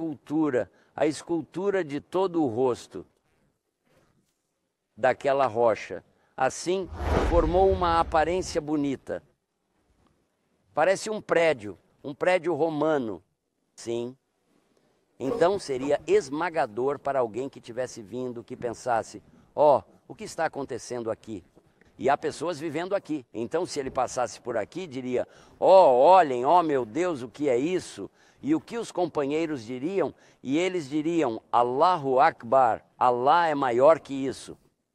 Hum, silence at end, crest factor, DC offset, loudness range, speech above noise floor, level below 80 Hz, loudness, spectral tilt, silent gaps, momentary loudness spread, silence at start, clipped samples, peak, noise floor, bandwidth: none; 0.4 s; 20 dB; under 0.1%; 9 LU; 53 dB; -46 dBFS; -26 LUFS; -5.5 dB/octave; none; 14 LU; 0 s; under 0.1%; -6 dBFS; -79 dBFS; 12 kHz